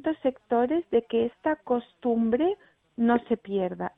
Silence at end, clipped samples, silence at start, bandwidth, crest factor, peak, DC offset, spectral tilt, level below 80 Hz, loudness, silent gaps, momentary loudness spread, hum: 0.1 s; under 0.1%; 0.05 s; 3.9 kHz; 18 dB; -10 dBFS; under 0.1%; -9.5 dB/octave; -62 dBFS; -27 LUFS; none; 5 LU; none